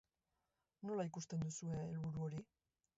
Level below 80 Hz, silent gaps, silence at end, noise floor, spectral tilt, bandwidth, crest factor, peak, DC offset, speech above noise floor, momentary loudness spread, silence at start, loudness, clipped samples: -72 dBFS; none; 0.55 s; -89 dBFS; -8 dB/octave; 7.6 kHz; 14 dB; -32 dBFS; under 0.1%; 45 dB; 4 LU; 0.8 s; -46 LUFS; under 0.1%